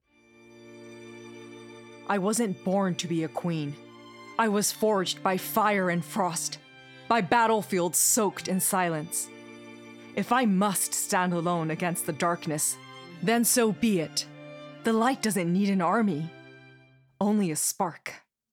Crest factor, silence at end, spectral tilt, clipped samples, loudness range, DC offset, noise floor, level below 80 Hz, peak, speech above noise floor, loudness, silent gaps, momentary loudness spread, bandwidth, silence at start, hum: 18 dB; 0.35 s; -4 dB/octave; under 0.1%; 4 LU; under 0.1%; -57 dBFS; -72 dBFS; -10 dBFS; 31 dB; -26 LUFS; none; 22 LU; 18.5 kHz; 0.6 s; none